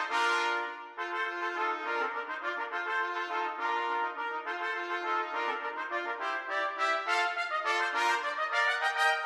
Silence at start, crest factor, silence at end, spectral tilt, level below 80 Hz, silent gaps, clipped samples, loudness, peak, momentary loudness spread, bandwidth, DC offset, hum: 0 s; 16 dB; 0 s; 1 dB/octave; -86 dBFS; none; under 0.1%; -31 LUFS; -16 dBFS; 7 LU; 15 kHz; under 0.1%; none